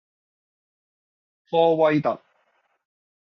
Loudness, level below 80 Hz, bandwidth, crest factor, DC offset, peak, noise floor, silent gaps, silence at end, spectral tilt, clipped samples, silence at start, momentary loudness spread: -21 LUFS; -74 dBFS; 6.2 kHz; 20 dB; under 0.1%; -6 dBFS; -68 dBFS; none; 1.05 s; -5 dB/octave; under 0.1%; 1.5 s; 10 LU